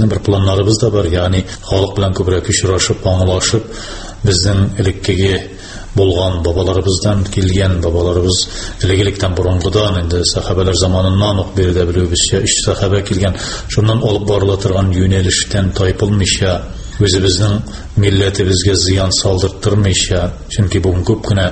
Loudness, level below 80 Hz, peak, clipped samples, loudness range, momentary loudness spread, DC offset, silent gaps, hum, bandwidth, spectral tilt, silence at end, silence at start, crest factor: -14 LUFS; -28 dBFS; 0 dBFS; under 0.1%; 2 LU; 5 LU; under 0.1%; none; none; 8.8 kHz; -5 dB/octave; 0 s; 0 s; 12 dB